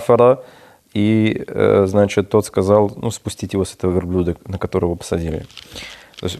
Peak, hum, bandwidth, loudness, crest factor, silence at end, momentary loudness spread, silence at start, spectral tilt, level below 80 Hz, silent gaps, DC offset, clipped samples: 0 dBFS; none; 14 kHz; -18 LUFS; 18 dB; 0 s; 14 LU; 0 s; -6.5 dB/octave; -46 dBFS; none; under 0.1%; under 0.1%